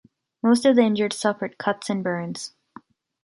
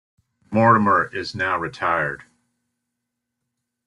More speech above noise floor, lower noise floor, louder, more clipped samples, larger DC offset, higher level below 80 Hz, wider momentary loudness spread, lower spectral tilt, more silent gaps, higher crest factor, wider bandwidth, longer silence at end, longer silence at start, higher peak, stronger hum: second, 28 dB vs 61 dB; second, -49 dBFS vs -80 dBFS; about the same, -22 LUFS vs -20 LUFS; neither; neither; second, -70 dBFS vs -60 dBFS; first, 14 LU vs 11 LU; second, -5 dB/octave vs -7 dB/octave; neither; about the same, 18 dB vs 20 dB; about the same, 11.5 kHz vs 11 kHz; second, 0.75 s vs 1.65 s; about the same, 0.45 s vs 0.5 s; about the same, -4 dBFS vs -4 dBFS; neither